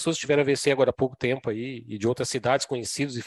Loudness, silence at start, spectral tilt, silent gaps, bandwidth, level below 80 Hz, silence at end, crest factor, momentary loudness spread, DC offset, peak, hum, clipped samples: -25 LUFS; 0 s; -4.5 dB/octave; none; 12.5 kHz; -60 dBFS; 0 s; 18 dB; 8 LU; under 0.1%; -8 dBFS; none; under 0.1%